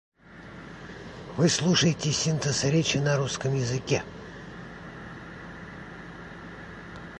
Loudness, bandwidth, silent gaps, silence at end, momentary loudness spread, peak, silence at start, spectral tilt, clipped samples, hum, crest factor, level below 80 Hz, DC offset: -25 LUFS; 11 kHz; none; 0 s; 19 LU; -10 dBFS; 0.25 s; -4.5 dB/octave; under 0.1%; none; 20 dB; -54 dBFS; under 0.1%